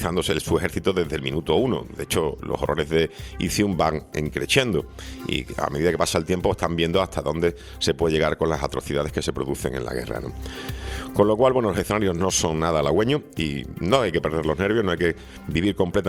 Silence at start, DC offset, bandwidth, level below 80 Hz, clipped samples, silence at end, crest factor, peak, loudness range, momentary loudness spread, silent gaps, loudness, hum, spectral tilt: 0 s; under 0.1%; 16.5 kHz; -40 dBFS; under 0.1%; 0 s; 20 dB; -2 dBFS; 3 LU; 8 LU; none; -23 LUFS; none; -5 dB/octave